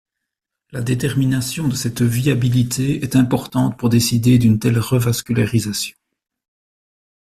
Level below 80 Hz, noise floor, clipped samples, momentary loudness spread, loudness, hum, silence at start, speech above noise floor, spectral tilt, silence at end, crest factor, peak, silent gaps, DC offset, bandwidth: -46 dBFS; -81 dBFS; under 0.1%; 8 LU; -18 LUFS; none; 0.75 s; 64 dB; -5.5 dB/octave; 1.4 s; 16 dB; -2 dBFS; none; under 0.1%; 14 kHz